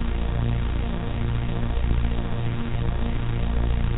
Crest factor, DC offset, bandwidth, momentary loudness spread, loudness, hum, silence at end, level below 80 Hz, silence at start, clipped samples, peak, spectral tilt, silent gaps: 12 dB; under 0.1%; 4 kHz; 3 LU; -27 LUFS; 60 Hz at -40 dBFS; 0 s; -26 dBFS; 0 s; under 0.1%; -10 dBFS; -7 dB/octave; none